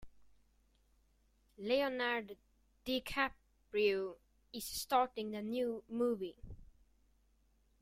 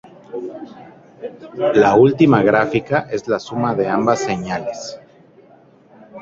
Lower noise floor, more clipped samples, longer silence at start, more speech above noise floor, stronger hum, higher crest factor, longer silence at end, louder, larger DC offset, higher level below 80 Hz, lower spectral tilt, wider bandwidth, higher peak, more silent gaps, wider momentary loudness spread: first, -73 dBFS vs -48 dBFS; neither; second, 0 s vs 0.3 s; first, 36 dB vs 32 dB; neither; about the same, 20 dB vs 16 dB; first, 1.15 s vs 0 s; second, -38 LUFS vs -16 LUFS; neither; second, -64 dBFS vs -54 dBFS; second, -3.5 dB/octave vs -6.5 dB/octave; first, 16 kHz vs 7.8 kHz; second, -20 dBFS vs -2 dBFS; neither; second, 16 LU vs 21 LU